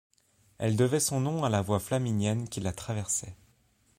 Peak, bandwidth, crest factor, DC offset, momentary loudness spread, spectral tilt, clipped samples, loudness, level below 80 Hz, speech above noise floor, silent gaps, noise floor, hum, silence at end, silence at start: -12 dBFS; 16 kHz; 18 dB; under 0.1%; 9 LU; -5 dB/octave; under 0.1%; -29 LUFS; -58 dBFS; 38 dB; none; -67 dBFS; none; 0.65 s; 0.6 s